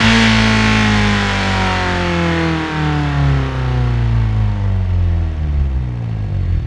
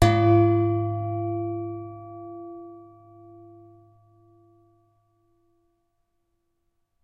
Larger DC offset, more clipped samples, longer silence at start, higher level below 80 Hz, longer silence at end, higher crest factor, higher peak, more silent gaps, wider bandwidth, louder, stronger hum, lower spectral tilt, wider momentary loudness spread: neither; neither; about the same, 0 s vs 0 s; first, -22 dBFS vs -48 dBFS; second, 0 s vs 4.2 s; second, 14 dB vs 24 dB; about the same, 0 dBFS vs -2 dBFS; neither; about the same, 11 kHz vs 11.5 kHz; first, -15 LUFS vs -23 LUFS; neither; second, -5.5 dB/octave vs -7.5 dB/octave; second, 7 LU vs 23 LU